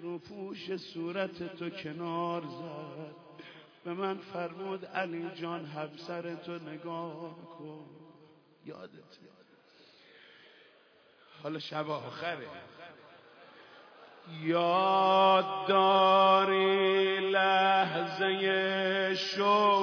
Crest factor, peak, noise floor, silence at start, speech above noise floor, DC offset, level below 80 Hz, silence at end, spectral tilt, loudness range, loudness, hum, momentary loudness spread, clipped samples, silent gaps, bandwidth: 20 dB; -12 dBFS; -63 dBFS; 0 s; 32 dB; under 0.1%; -84 dBFS; 0 s; -5.5 dB/octave; 19 LU; -29 LUFS; none; 24 LU; under 0.1%; none; 5.4 kHz